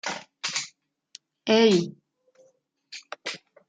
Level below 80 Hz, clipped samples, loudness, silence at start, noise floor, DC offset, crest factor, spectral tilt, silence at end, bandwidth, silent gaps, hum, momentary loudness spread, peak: -74 dBFS; under 0.1%; -25 LUFS; 0.05 s; -65 dBFS; under 0.1%; 20 dB; -4 dB/octave; 0.3 s; 9.6 kHz; none; none; 21 LU; -8 dBFS